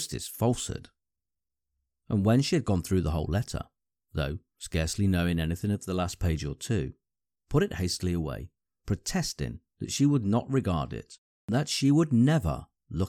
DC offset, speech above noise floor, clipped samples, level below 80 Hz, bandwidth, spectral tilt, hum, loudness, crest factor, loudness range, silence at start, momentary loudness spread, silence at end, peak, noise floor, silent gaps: under 0.1%; over 62 dB; under 0.1%; -44 dBFS; 16 kHz; -6 dB/octave; none; -29 LUFS; 18 dB; 5 LU; 0 s; 15 LU; 0 s; -12 dBFS; under -90 dBFS; 11.18-11.48 s